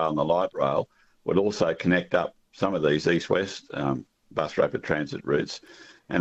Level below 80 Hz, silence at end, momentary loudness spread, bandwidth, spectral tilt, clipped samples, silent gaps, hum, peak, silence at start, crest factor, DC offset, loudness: -56 dBFS; 0 s; 11 LU; 8.2 kHz; -6 dB/octave; under 0.1%; none; none; -10 dBFS; 0 s; 16 dB; under 0.1%; -26 LUFS